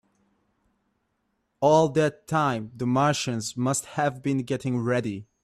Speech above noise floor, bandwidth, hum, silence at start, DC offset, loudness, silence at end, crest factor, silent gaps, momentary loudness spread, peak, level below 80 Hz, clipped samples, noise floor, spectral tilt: 50 dB; 14.5 kHz; none; 1.6 s; under 0.1%; -25 LUFS; 0.2 s; 20 dB; none; 8 LU; -8 dBFS; -62 dBFS; under 0.1%; -75 dBFS; -5.5 dB/octave